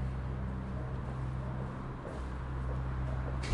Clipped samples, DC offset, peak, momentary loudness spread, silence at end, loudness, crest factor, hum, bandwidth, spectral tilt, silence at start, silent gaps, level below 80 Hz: under 0.1%; under 0.1%; -18 dBFS; 4 LU; 0 s; -39 LUFS; 18 dB; none; 10.5 kHz; -7.5 dB/octave; 0 s; none; -40 dBFS